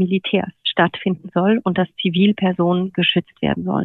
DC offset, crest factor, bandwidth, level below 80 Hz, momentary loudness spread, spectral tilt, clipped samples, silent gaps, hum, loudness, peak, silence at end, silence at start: under 0.1%; 16 dB; 4.2 kHz; -52 dBFS; 5 LU; -9 dB/octave; under 0.1%; none; none; -19 LUFS; -2 dBFS; 0 s; 0 s